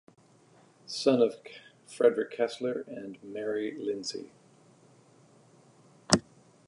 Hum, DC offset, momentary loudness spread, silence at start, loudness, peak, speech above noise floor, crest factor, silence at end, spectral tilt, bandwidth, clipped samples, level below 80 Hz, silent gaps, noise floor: none; under 0.1%; 21 LU; 0.9 s; -30 LUFS; 0 dBFS; 31 dB; 32 dB; 0.45 s; -4 dB/octave; 11.5 kHz; under 0.1%; -62 dBFS; none; -61 dBFS